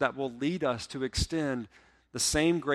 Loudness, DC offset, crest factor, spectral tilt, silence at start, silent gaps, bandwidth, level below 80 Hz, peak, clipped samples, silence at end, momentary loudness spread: -30 LUFS; under 0.1%; 20 dB; -4 dB/octave; 0 s; none; 15.5 kHz; -46 dBFS; -10 dBFS; under 0.1%; 0 s; 11 LU